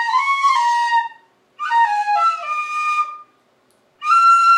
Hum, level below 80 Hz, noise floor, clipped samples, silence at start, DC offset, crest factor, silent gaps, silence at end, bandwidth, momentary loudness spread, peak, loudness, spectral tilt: none; under -90 dBFS; -59 dBFS; under 0.1%; 0 s; under 0.1%; 12 dB; none; 0 s; 11.5 kHz; 13 LU; -4 dBFS; -16 LUFS; 2.5 dB/octave